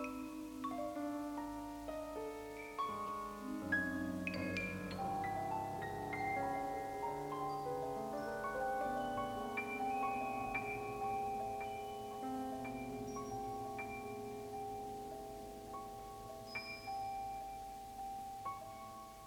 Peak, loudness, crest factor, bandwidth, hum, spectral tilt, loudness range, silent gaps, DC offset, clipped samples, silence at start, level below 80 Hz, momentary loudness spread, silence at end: -26 dBFS; -43 LUFS; 18 dB; 18 kHz; none; -5 dB/octave; 6 LU; none; under 0.1%; under 0.1%; 0 s; -64 dBFS; 9 LU; 0 s